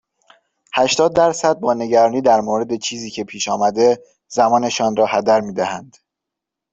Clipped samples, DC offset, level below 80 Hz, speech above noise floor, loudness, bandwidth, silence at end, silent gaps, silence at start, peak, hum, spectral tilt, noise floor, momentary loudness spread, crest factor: under 0.1%; under 0.1%; -58 dBFS; 66 dB; -17 LUFS; 8.2 kHz; 0.9 s; none; 0.75 s; -2 dBFS; none; -3.5 dB/octave; -83 dBFS; 10 LU; 16 dB